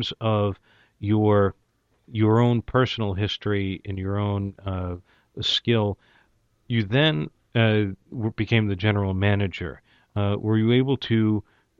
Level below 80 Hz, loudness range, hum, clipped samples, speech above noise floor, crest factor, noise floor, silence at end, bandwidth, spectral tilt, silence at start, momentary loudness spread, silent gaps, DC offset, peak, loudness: -52 dBFS; 3 LU; none; under 0.1%; 41 dB; 16 dB; -64 dBFS; 0.4 s; 7.4 kHz; -7.5 dB/octave; 0 s; 11 LU; none; under 0.1%; -6 dBFS; -24 LUFS